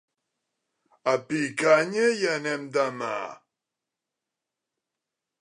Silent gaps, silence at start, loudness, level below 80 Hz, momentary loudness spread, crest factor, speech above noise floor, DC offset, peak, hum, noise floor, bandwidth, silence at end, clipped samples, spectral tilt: none; 1.05 s; -25 LUFS; -82 dBFS; 11 LU; 22 dB; 62 dB; under 0.1%; -6 dBFS; none; -87 dBFS; 11 kHz; 2.1 s; under 0.1%; -4 dB/octave